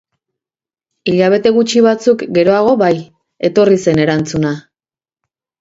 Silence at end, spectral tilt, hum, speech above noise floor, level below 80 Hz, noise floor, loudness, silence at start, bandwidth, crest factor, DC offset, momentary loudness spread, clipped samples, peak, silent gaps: 1 s; -6 dB/octave; none; over 79 dB; -52 dBFS; under -90 dBFS; -13 LUFS; 1.05 s; 8 kHz; 14 dB; under 0.1%; 9 LU; under 0.1%; 0 dBFS; none